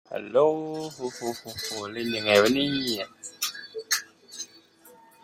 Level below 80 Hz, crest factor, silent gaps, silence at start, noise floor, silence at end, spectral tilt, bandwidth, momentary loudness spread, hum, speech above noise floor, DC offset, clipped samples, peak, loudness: -66 dBFS; 22 dB; none; 0.1 s; -54 dBFS; 0.35 s; -3 dB/octave; 16.5 kHz; 18 LU; none; 28 dB; under 0.1%; under 0.1%; -6 dBFS; -26 LUFS